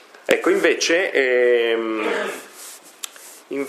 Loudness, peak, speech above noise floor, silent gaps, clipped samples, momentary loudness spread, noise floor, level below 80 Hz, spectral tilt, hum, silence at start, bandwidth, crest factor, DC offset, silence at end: -19 LUFS; -2 dBFS; 22 dB; none; under 0.1%; 18 LU; -41 dBFS; -76 dBFS; -2 dB/octave; none; 0.3 s; 15.5 kHz; 20 dB; under 0.1%; 0 s